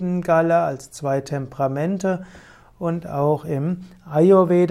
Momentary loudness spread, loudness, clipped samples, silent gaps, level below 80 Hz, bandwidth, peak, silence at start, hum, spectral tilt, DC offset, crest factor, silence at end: 14 LU; -21 LUFS; under 0.1%; none; -56 dBFS; 13.5 kHz; -4 dBFS; 0 s; none; -8 dB/octave; under 0.1%; 16 dB; 0 s